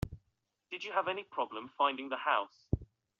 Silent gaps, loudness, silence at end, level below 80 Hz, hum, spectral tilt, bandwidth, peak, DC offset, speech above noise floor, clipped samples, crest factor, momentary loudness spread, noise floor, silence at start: none; -35 LUFS; 0.35 s; -54 dBFS; none; -3 dB/octave; 7.4 kHz; -14 dBFS; under 0.1%; 46 dB; under 0.1%; 22 dB; 9 LU; -81 dBFS; 0.05 s